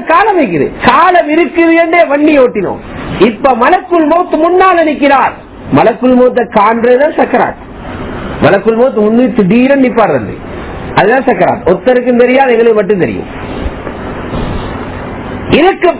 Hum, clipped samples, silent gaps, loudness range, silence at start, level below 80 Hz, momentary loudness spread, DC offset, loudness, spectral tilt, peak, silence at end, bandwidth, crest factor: none; 3%; none; 2 LU; 0 s; -32 dBFS; 14 LU; under 0.1%; -8 LUFS; -10 dB/octave; 0 dBFS; 0 s; 4 kHz; 8 dB